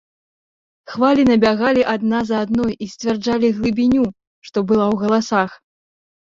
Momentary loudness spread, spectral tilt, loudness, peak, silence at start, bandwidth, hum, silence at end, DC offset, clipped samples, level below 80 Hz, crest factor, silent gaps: 9 LU; -6 dB/octave; -17 LUFS; -2 dBFS; 0.9 s; 7.6 kHz; none; 0.8 s; under 0.1%; under 0.1%; -50 dBFS; 16 dB; 4.27-4.42 s